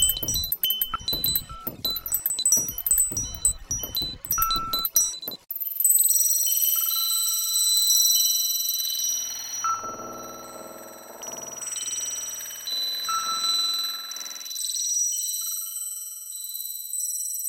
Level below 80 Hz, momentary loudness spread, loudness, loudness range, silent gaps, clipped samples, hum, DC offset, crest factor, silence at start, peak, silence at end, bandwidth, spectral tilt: -48 dBFS; 15 LU; -23 LUFS; 10 LU; none; under 0.1%; none; under 0.1%; 22 dB; 0 s; -4 dBFS; 0 s; 17.5 kHz; 0.5 dB/octave